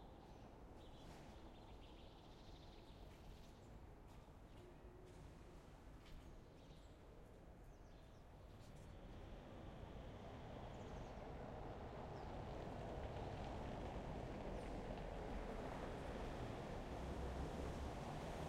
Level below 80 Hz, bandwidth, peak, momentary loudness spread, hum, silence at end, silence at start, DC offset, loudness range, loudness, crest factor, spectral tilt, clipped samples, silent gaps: -58 dBFS; 16 kHz; -36 dBFS; 13 LU; none; 0 s; 0 s; under 0.1%; 12 LU; -55 LUFS; 16 dB; -6.5 dB/octave; under 0.1%; none